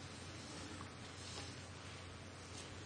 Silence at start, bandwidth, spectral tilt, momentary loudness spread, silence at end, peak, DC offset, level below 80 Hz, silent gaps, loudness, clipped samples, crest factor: 0 s; 9.8 kHz; -3.5 dB/octave; 3 LU; 0 s; -34 dBFS; under 0.1%; -68 dBFS; none; -51 LUFS; under 0.1%; 18 dB